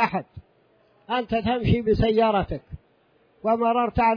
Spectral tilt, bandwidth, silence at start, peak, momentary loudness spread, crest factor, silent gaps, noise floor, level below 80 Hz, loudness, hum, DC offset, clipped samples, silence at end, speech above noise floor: -9 dB/octave; 5.4 kHz; 0 s; -8 dBFS; 12 LU; 16 dB; none; -62 dBFS; -40 dBFS; -23 LUFS; none; under 0.1%; under 0.1%; 0 s; 40 dB